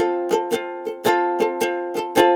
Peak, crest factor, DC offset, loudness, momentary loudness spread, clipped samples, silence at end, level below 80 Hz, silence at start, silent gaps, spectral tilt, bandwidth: 0 dBFS; 20 dB; under 0.1%; -22 LUFS; 6 LU; under 0.1%; 0 s; -62 dBFS; 0 s; none; -4 dB/octave; 18 kHz